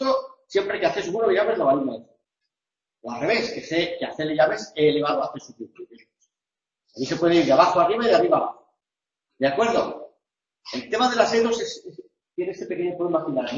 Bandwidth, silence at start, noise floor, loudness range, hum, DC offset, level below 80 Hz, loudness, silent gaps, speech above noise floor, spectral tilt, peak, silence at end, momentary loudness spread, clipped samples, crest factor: 7.6 kHz; 0 s; -90 dBFS; 4 LU; none; under 0.1%; -62 dBFS; -22 LUFS; none; 67 dB; -4.5 dB/octave; -2 dBFS; 0 s; 17 LU; under 0.1%; 20 dB